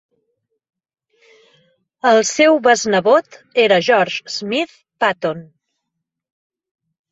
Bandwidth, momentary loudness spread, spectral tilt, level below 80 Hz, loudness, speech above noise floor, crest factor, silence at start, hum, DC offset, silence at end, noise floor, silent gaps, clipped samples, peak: 8.2 kHz; 11 LU; -3 dB/octave; -66 dBFS; -15 LUFS; 63 dB; 18 dB; 2.05 s; none; under 0.1%; 1.7 s; -79 dBFS; none; under 0.1%; -2 dBFS